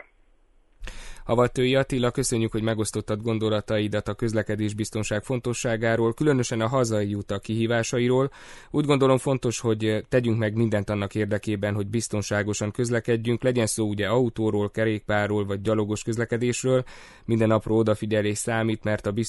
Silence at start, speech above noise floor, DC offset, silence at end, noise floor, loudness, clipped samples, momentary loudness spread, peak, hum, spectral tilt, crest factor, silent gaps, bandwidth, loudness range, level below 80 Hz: 0.8 s; 35 dB; under 0.1%; 0 s; -59 dBFS; -25 LUFS; under 0.1%; 6 LU; -6 dBFS; none; -5.5 dB/octave; 18 dB; none; 11.5 kHz; 2 LU; -48 dBFS